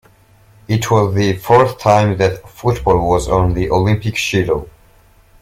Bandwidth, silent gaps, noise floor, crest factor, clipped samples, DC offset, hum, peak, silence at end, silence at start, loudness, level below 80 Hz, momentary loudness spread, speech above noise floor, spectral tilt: 16 kHz; none; -48 dBFS; 14 dB; under 0.1%; under 0.1%; none; 0 dBFS; 0.7 s; 0.7 s; -15 LUFS; -32 dBFS; 7 LU; 34 dB; -6 dB/octave